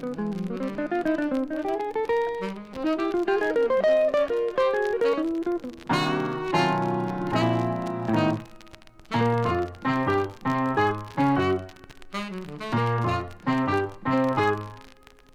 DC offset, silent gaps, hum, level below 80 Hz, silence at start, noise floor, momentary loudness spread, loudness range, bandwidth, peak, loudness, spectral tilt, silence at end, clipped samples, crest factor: under 0.1%; none; none; -54 dBFS; 0 s; -51 dBFS; 8 LU; 3 LU; 15 kHz; -10 dBFS; -26 LUFS; -7 dB/octave; 0.45 s; under 0.1%; 16 dB